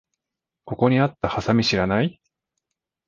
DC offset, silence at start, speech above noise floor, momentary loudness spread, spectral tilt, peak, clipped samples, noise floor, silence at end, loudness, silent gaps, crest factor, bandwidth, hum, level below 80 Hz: under 0.1%; 0.65 s; 65 dB; 7 LU; -6.5 dB/octave; -4 dBFS; under 0.1%; -86 dBFS; 0.95 s; -21 LUFS; none; 20 dB; 7.4 kHz; none; -48 dBFS